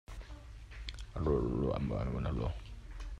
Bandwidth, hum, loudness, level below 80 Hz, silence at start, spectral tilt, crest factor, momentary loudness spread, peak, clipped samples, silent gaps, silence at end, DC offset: 10.5 kHz; none; -37 LUFS; -44 dBFS; 0.1 s; -8 dB/octave; 18 dB; 18 LU; -20 dBFS; under 0.1%; none; 0 s; under 0.1%